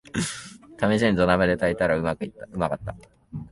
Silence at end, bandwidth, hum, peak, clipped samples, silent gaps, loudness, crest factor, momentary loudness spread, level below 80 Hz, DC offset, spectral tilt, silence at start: 0 s; 11.5 kHz; none; -4 dBFS; under 0.1%; none; -24 LUFS; 20 dB; 18 LU; -46 dBFS; under 0.1%; -5.5 dB/octave; 0.15 s